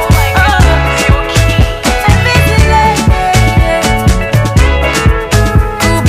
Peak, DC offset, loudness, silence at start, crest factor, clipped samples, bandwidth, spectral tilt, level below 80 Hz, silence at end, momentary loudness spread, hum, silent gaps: 0 dBFS; under 0.1%; -9 LUFS; 0 s; 8 dB; 0.3%; 16 kHz; -5 dB/octave; -14 dBFS; 0 s; 3 LU; none; none